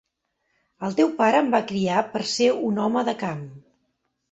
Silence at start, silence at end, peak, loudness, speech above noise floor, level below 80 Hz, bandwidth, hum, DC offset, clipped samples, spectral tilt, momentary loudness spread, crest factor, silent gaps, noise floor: 0.8 s; 0.75 s; -6 dBFS; -23 LUFS; 53 dB; -66 dBFS; 8.2 kHz; none; under 0.1%; under 0.1%; -5 dB/octave; 12 LU; 18 dB; none; -75 dBFS